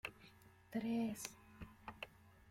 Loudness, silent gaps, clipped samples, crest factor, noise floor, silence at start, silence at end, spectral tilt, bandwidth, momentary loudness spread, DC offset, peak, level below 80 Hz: -46 LUFS; none; under 0.1%; 20 dB; -65 dBFS; 0.05 s; 0 s; -4.5 dB/octave; 16.5 kHz; 22 LU; under 0.1%; -28 dBFS; -70 dBFS